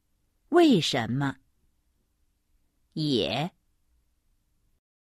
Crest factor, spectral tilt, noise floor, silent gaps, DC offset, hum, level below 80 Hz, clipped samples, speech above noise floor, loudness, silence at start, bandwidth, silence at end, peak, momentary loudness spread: 20 dB; -5.5 dB/octave; -72 dBFS; none; under 0.1%; none; -64 dBFS; under 0.1%; 48 dB; -25 LUFS; 0.5 s; 14.5 kHz; 1.6 s; -8 dBFS; 13 LU